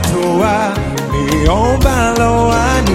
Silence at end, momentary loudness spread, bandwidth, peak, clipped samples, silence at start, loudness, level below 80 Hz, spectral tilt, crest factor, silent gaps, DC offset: 0 s; 5 LU; 16.5 kHz; 0 dBFS; under 0.1%; 0 s; -13 LUFS; -20 dBFS; -5.5 dB/octave; 12 dB; none; under 0.1%